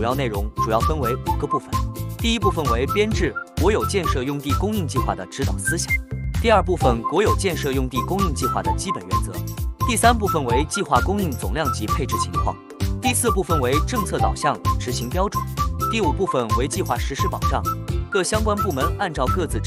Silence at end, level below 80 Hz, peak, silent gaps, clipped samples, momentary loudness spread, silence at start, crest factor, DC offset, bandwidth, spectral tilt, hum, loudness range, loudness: 0 s; -30 dBFS; -2 dBFS; none; under 0.1%; 6 LU; 0 s; 20 dB; under 0.1%; 16 kHz; -5 dB/octave; none; 2 LU; -22 LUFS